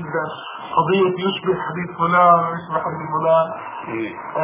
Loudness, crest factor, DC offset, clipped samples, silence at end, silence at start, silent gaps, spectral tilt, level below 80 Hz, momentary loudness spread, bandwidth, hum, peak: -19 LUFS; 16 dB; under 0.1%; under 0.1%; 0 s; 0 s; none; -10 dB/octave; -60 dBFS; 13 LU; 3.8 kHz; none; -2 dBFS